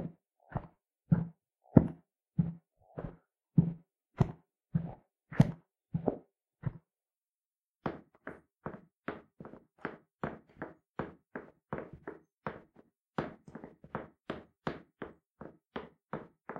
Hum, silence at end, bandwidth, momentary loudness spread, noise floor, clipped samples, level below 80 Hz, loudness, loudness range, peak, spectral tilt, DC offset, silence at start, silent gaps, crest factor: none; 0 s; 7 kHz; 21 LU; under -90 dBFS; under 0.1%; -58 dBFS; -37 LUFS; 13 LU; -4 dBFS; -9.5 dB/octave; under 0.1%; 0 s; 7.28-7.80 s, 8.99-9.03 s, 10.15-10.19 s, 10.89-10.94 s, 12.34-12.42 s, 12.99-13.13 s, 15.31-15.35 s; 34 dB